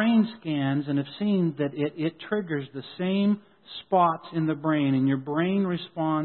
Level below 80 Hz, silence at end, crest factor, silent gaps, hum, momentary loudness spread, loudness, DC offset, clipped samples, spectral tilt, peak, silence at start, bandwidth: -70 dBFS; 0 s; 16 dB; none; none; 9 LU; -26 LUFS; under 0.1%; under 0.1%; -11.5 dB/octave; -10 dBFS; 0 s; 4.4 kHz